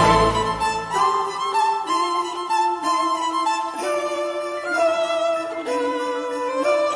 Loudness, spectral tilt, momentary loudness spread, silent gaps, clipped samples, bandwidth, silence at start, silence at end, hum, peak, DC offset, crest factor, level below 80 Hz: -22 LUFS; -4 dB/octave; 5 LU; none; under 0.1%; 10.5 kHz; 0 s; 0 s; none; -4 dBFS; under 0.1%; 16 dB; -44 dBFS